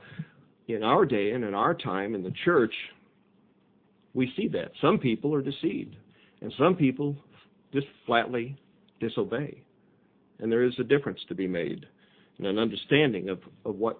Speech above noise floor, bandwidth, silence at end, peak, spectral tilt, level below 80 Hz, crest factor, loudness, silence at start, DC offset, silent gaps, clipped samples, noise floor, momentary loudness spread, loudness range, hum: 37 dB; 4.6 kHz; 0 s; -8 dBFS; -10 dB/octave; -66 dBFS; 22 dB; -28 LUFS; 0 s; under 0.1%; none; under 0.1%; -64 dBFS; 15 LU; 3 LU; none